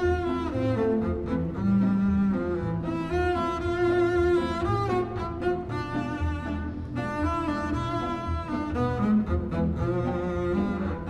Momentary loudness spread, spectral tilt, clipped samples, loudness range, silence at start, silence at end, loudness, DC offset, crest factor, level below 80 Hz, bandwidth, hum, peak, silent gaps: 7 LU; -8 dB/octave; under 0.1%; 4 LU; 0 s; 0 s; -27 LUFS; under 0.1%; 12 dB; -38 dBFS; 9.4 kHz; none; -14 dBFS; none